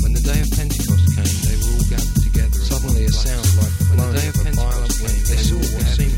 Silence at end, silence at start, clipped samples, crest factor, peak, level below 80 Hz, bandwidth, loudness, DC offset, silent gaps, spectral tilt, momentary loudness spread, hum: 0 s; 0 s; under 0.1%; 12 dB; -4 dBFS; -18 dBFS; 17 kHz; -18 LUFS; under 0.1%; none; -5 dB/octave; 4 LU; none